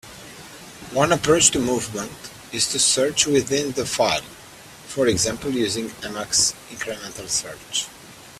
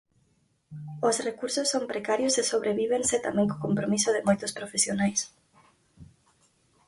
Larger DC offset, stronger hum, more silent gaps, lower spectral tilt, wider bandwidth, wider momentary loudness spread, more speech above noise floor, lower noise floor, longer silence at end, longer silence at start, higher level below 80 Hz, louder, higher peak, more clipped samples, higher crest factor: neither; neither; neither; about the same, -2.5 dB/octave vs -3.5 dB/octave; first, 16 kHz vs 11.5 kHz; first, 22 LU vs 6 LU; second, 21 dB vs 42 dB; second, -43 dBFS vs -69 dBFS; second, 0 s vs 0.8 s; second, 0.05 s vs 0.7 s; first, -52 dBFS vs -64 dBFS; first, -21 LUFS vs -27 LUFS; first, 0 dBFS vs -10 dBFS; neither; first, 24 dB vs 18 dB